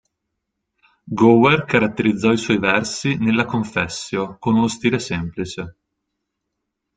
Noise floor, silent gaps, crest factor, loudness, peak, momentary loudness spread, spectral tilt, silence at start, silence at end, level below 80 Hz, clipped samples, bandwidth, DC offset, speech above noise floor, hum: -78 dBFS; none; 18 dB; -18 LUFS; -2 dBFS; 13 LU; -5.5 dB/octave; 1.05 s; 1.25 s; -52 dBFS; under 0.1%; 9.4 kHz; under 0.1%; 60 dB; none